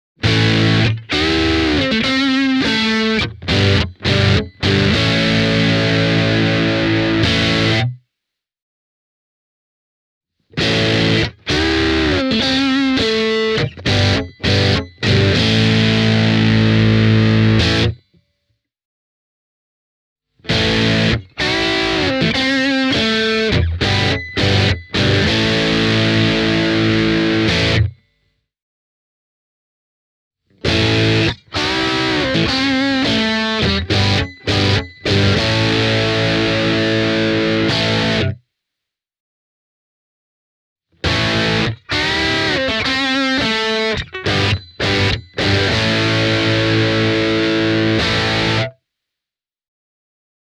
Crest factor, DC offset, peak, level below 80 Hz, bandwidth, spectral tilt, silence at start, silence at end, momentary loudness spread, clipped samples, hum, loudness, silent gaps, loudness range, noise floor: 16 dB; under 0.1%; 0 dBFS; -34 dBFS; 10.5 kHz; -5.5 dB/octave; 0.2 s; 1.85 s; 5 LU; under 0.1%; none; -15 LUFS; 8.62-10.21 s, 18.85-20.16 s, 28.62-30.31 s, 39.20-40.76 s; 6 LU; -88 dBFS